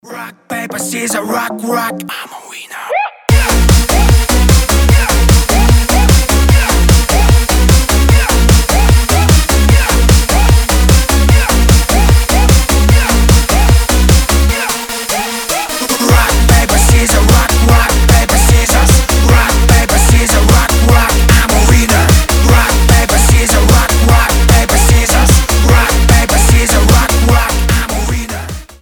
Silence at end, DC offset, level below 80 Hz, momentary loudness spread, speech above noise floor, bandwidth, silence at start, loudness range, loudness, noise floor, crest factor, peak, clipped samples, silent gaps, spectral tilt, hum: 0.15 s; under 0.1%; -10 dBFS; 8 LU; 11 dB; over 20 kHz; 0.05 s; 3 LU; -9 LUFS; -28 dBFS; 8 dB; 0 dBFS; 0.3%; none; -4 dB/octave; none